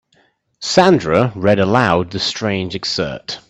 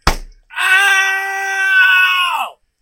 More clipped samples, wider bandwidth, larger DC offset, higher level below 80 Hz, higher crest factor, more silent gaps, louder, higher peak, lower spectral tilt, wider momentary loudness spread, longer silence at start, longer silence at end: neither; second, 8.6 kHz vs 16.5 kHz; neither; second, -48 dBFS vs -30 dBFS; about the same, 16 dB vs 14 dB; neither; second, -16 LUFS vs -12 LUFS; about the same, 0 dBFS vs 0 dBFS; first, -5 dB/octave vs -1 dB/octave; second, 9 LU vs 15 LU; first, 0.6 s vs 0.05 s; second, 0.1 s vs 0.3 s